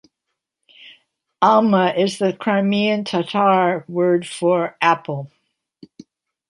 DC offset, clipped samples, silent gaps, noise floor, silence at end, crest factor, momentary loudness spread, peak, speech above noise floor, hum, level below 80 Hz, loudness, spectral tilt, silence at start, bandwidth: under 0.1%; under 0.1%; none; -79 dBFS; 1.25 s; 18 dB; 7 LU; -2 dBFS; 62 dB; none; -68 dBFS; -18 LUFS; -6 dB/octave; 0.85 s; 11.5 kHz